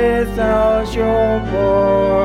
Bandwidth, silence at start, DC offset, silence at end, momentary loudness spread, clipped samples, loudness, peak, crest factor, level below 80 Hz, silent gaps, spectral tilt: 15 kHz; 0 s; under 0.1%; 0 s; 3 LU; under 0.1%; -15 LUFS; -4 dBFS; 10 dB; -28 dBFS; none; -7 dB/octave